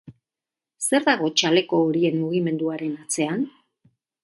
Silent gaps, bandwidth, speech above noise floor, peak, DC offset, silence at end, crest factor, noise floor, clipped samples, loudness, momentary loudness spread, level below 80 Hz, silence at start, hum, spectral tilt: none; 12 kHz; 68 dB; -4 dBFS; under 0.1%; 0.75 s; 20 dB; -89 dBFS; under 0.1%; -22 LUFS; 9 LU; -70 dBFS; 0.1 s; none; -4 dB/octave